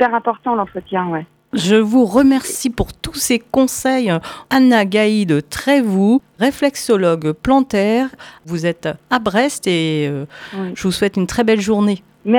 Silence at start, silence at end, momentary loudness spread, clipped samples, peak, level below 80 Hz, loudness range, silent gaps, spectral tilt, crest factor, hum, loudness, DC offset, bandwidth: 0 s; 0 s; 10 LU; under 0.1%; 0 dBFS; -42 dBFS; 3 LU; none; -5 dB/octave; 16 dB; none; -16 LUFS; under 0.1%; 18 kHz